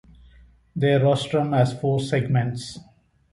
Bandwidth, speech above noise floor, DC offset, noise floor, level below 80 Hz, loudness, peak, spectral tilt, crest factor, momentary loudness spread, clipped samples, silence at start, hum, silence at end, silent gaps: 11.5 kHz; 31 dB; under 0.1%; -52 dBFS; -54 dBFS; -22 LUFS; -8 dBFS; -7 dB/octave; 16 dB; 16 LU; under 0.1%; 0.75 s; none; 0.5 s; none